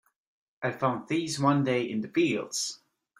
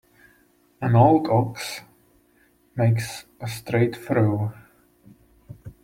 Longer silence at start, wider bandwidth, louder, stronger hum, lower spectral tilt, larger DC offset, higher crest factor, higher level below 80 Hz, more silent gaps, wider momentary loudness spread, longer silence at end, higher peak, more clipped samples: second, 0.6 s vs 0.8 s; about the same, 15.5 kHz vs 16 kHz; second, -28 LUFS vs -22 LUFS; neither; second, -4.5 dB/octave vs -7 dB/octave; neither; about the same, 18 dB vs 20 dB; second, -70 dBFS vs -56 dBFS; neither; second, 9 LU vs 19 LU; first, 0.45 s vs 0.15 s; second, -10 dBFS vs -4 dBFS; neither